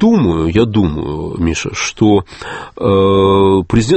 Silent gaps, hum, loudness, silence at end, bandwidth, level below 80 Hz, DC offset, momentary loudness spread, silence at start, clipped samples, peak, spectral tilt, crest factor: none; none; -13 LUFS; 0 s; 8.8 kHz; -32 dBFS; under 0.1%; 11 LU; 0 s; under 0.1%; 0 dBFS; -6 dB/octave; 12 dB